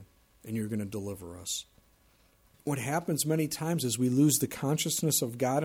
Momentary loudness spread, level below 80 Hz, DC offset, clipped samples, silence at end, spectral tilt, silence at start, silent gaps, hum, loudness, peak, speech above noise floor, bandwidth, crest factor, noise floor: 13 LU; -66 dBFS; under 0.1%; under 0.1%; 0 s; -4.5 dB/octave; 0 s; none; none; -30 LUFS; -12 dBFS; 35 dB; 17 kHz; 18 dB; -65 dBFS